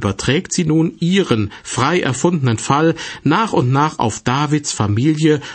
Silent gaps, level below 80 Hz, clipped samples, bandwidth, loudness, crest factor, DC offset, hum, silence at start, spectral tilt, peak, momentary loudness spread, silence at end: none; -46 dBFS; under 0.1%; 8.8 kHz; -16 LUFS; 14 dB; under 0.1%; none; 0 s; -5.5 dB/octave; -2 dBFS; 3 LU; 0 s